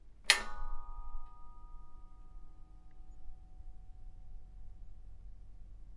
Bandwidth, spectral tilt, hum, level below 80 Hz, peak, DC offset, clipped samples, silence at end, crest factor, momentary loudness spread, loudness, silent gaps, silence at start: 11 kHz; 0 dB/octave; none; -46 dBFS; -6 dBFS; under 0.1%; under 0.1%; 0 s; 34 dB; 30 LU; -32 LUFS; none; 0.05 s